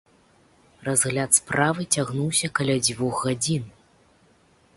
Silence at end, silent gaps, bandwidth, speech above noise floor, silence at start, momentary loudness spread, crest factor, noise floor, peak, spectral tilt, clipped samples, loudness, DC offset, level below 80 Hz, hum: 1.05 s; none; 12 kHz; 36 dB; 0.8 s; 7 LU; 22 dB; -59 dBFS; -4 dBFS; -3.5 dB/octave; under 0.1%; -22 LUFS; under 0.1%; -58 dBFS; none